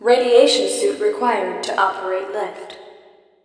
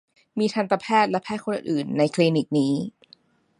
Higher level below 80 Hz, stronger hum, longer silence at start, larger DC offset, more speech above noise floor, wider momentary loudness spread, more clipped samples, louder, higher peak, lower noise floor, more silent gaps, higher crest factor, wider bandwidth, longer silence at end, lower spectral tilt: about the same, -70 dBFS vs -70 dBFS; neither; second, 0 s vs 0.35 s; neither; about the same, 32 dB vs 35 dB; first, 15 LU vs 8 LU; neither; first, -18 LUFS vs -23 LUFS; first, 0 dBFS vs -6 dBFS; second, -49 dBFS vs -57 dBFS; neither; about the same, 18 dB vs 18 dB; about the same, 10.5 kHz vs 11.5 kHz; second, 0.55 s vs 0.7 s; second, -1.5 dB/octave vs -6 dB/octave